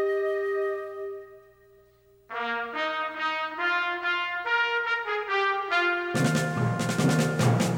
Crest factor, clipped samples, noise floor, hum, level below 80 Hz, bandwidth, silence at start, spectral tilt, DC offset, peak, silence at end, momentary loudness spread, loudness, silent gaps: 16 dB; under 0.1%; -59 dBFS; 60 Hz at -65 dBFS; -64 dBFS; 17 kHz; 0 s; -5 dB/octave; under 0.1%; -12 dBFS; 0 s; 8 LU; -26 LUFS; none